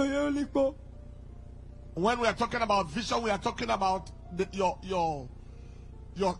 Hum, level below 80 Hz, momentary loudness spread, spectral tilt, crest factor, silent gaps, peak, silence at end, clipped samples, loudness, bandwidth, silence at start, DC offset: 60 Hz at -50 dBFS; -48 dBFS; 21 LU; -5 dB/octave; 18 dB; none; -12 dBFS; 0 s; under 0.1%; -30 LUFS; 11.5 kHz; 0 s; under 0.1%